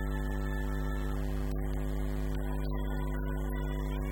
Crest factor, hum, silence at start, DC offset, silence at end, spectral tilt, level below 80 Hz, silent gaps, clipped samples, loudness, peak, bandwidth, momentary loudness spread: 10 dB; none; 0 s; under 0.1%; 0 s; -7 dB/octave; -34 dBFS; none; under 0.1%; -36 LUFS; -22 dBFS; 18 kHz; 0 LU